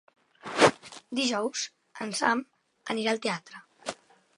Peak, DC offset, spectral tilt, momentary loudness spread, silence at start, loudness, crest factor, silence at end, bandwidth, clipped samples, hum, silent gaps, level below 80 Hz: -6 dBFS; under 0.1%; -3 dB/octave; 22 LU; 0.45 s; -28 LUFS; 24 dB; 0.45 s; 11.5 kHz; under 0.1%; none; none; -72 dBFS